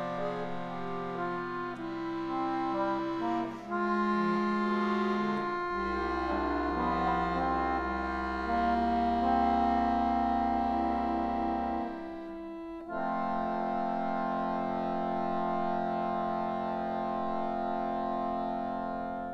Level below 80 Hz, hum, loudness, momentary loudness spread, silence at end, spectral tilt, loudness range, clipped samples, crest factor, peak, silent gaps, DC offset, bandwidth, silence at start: -50 dBFS; none; -32 LUFS; 8 LU; 0 s; -7.5 dB/octave; 5 LU; under 0.1%; 16 dB; -16 dBFS; none; under 0.1%; 8.2 kHz; 0 s